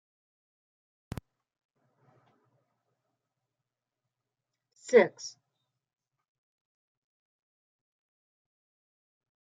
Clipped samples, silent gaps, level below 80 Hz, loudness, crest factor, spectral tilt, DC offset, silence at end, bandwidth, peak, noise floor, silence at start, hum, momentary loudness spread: under 0.1%; none; -68 dBFS; -25 LUFS; 28 dB; -4.5 dB/octave; under 0.1%; 4.3 s; 9 kHz; -8 dBFS; -89 dBFS; 4.9 s; none; 21 LU